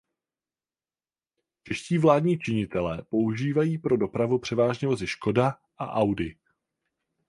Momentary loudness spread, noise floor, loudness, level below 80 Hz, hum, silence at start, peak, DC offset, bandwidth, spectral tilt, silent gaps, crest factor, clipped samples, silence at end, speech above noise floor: 10 LU; under -90 dBFS; -26 LUFS; -56 dBFS; none; 1.65 s; -6 dBFS; under 0.1%; 11.5 kHz; -7 dB/octave; none; 22 dB; under 0.1%; 0.95 s; over 65 dB